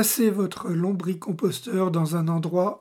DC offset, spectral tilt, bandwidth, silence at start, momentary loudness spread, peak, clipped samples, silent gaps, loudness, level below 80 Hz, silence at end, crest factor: under 0.1%; -5.5 dB/octave; 18.5 kHz; 0 s; 5 LU; -8 dBFS; under 0.1%; none; -25 LUFS; -72 dBFS; 0.05 s; 16 dB